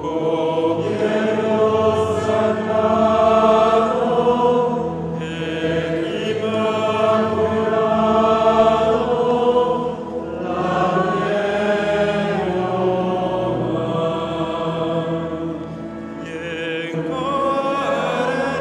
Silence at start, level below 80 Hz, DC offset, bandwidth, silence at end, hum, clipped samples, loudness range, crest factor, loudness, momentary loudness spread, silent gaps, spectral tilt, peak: 0 s; -50 dBFS; under 0.1%; 10.5 kHz; 0 s; none; under 0.1%; 7 LU; 14 dB; -19 LUFS; 10 LU; none; -6.5 dB/octave; -4 dBFS